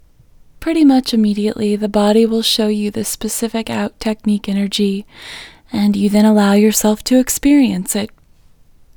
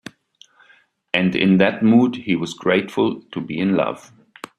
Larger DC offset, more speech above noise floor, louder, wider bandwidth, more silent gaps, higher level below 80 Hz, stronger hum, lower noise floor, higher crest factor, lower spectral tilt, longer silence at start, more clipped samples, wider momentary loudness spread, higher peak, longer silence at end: neither; second, 33 dB vs 37 dB; first, -15 LUFS vs -19 LUFS; first, over 20 kHz vs 10.5 kHz; neither; first, -44 dBFS vs -60 dBFS; neither; second, -47 dBFS vs -56 dBFS; about the same, 16 dB vs 20 dB; second, -4.5 dB/octave vs -6.5 dB/octave; second, 0.6 s vs 1.15 s; neither; about the same, 11 LU vs 12 LU; about the same, 0 dBFS vs 0 dBFS; first, 0.9 s vs 0.6 s